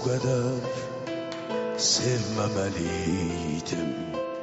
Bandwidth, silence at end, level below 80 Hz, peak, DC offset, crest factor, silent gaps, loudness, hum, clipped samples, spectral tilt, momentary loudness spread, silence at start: 8 kHz; 0 s; -52 dBFS; -12 dBFS; under 0.1%; 16 dB; none; -28 LUFS; none; under 0.1%; -5 dB/octave; 10 LU; 0 s